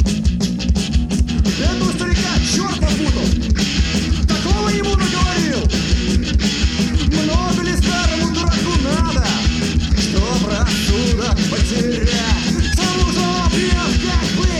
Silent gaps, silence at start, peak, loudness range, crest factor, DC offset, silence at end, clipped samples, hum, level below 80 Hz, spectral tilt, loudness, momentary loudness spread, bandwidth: none; 0 s; -2 dBFS; 1 LU; 14 dB; under 0.1%; 0 s; under 0.1%; none; -20 dBFS; -4.5 dB/octave; -17 LUFS; 2 LU; 13 kHz